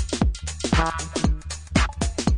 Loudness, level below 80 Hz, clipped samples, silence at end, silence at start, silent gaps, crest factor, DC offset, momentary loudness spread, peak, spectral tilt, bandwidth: -25 LUFS; -28 dBFS; under 0.1%; 0 s; 0 s; none; 20 dB; under 0.1%; 4 LU; -4 dBFS; -4.5 dB/octave; 11 kHz